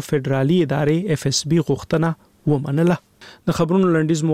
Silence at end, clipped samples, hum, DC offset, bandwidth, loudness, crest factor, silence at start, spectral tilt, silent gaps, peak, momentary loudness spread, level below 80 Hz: 0 s; under 0.1%; none; 0.2%; 15 kHz; -19 LUFS; 14 dB; 0 s; -6 dB/octave; none; -6 dBFS; 7 LU; -50 dBFS